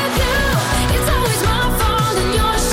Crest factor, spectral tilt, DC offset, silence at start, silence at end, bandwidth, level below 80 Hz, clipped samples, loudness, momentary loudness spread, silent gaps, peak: 10 dB; -4 dB/octave; under 0.1%; 0 s; 0 s; 16.5 kHz; -22 dBFS; under 0.1%; -16 LUFS; 1 LU; none; -6 dBFS